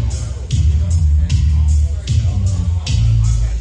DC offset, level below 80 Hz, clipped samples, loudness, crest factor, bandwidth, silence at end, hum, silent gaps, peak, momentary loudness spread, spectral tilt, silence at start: under 0.1%; -16 dBFS; under 0.1%; -16 LUFS; 10 dB; 9.6 kHz; 0 s; none; none; -4 dBFS; 4 LU; -6 dB/octave; 0 s